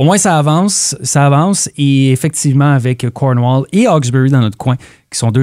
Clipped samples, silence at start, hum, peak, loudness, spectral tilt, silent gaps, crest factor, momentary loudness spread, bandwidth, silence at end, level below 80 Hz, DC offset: under 0.1%; 0 s; none; 0 dBFS; -12 LUFS; -5.5 dB/octave; none; 10 dB; 7 LU; 15 kHz; 0 s; -52 dBFS; under 0.1%